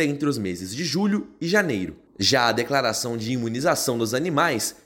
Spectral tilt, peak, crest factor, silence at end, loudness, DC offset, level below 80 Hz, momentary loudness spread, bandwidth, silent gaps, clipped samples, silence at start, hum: -4 dB/octave; -6 dBFS; 18 dB; 0.15 s; -23 LUFS; under 0.1%; -58 dBFS; 7 LU; 17 kHz; none; under 0.1%; 0 s; none